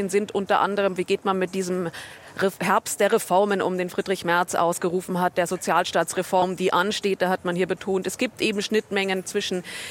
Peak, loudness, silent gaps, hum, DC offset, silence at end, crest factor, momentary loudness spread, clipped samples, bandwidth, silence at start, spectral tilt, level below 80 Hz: -6 dBFS; -24 LUFS; none; none; under 0.1%; 0 s; 18 dB; 5 LU; under 0.1%; 17 kHz; 0 s; -4 dB/octave; -64 dBFS